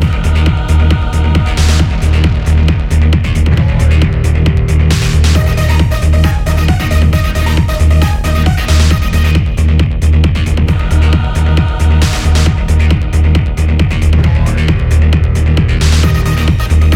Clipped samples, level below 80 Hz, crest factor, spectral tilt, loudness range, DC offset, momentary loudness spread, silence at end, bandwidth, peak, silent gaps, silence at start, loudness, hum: under 0.1%; -14 dBFS; 8 dB; -6 dB/octave; 0 LU; 0.2%; 2 LU; 0 s; 15.5 kHz; 0 dBFS; none; 0 s; -11 LUFS; none